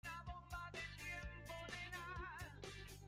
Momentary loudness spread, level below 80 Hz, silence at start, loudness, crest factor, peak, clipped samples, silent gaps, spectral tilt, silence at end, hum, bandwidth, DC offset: 4 LU; -60 dBFS; 0.05 s; -51 LUFS; 14 dB; -38 dBFS; under 0.1%; none; -4 dB/octave; 0 s; none; 16 kHz; under 0.1%